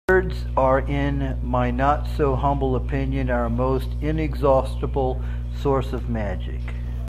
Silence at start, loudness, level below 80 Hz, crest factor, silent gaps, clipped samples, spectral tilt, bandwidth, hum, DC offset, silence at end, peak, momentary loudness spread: 0.1 s; -23 LUFS; -26 dBFS; 16 dB; none; under 0.1%; -8.5 dB/octave; 10 kHz; 60 Hz at -25 dBFS; under 0.1%; 0 s; -6 dBFS; 7 LU